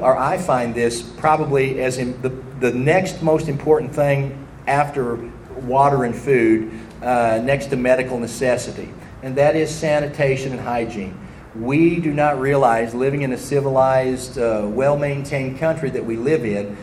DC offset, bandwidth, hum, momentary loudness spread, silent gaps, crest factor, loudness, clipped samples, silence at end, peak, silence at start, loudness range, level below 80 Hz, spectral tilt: under 0.1%; 14 kHz; none; 11 LU; none; 18 dB; -19 LUFS; under 0.1%; 0 s; -2 dBFS; 0 s; 2 LU; -44 dBFS; -6.5 dB/octave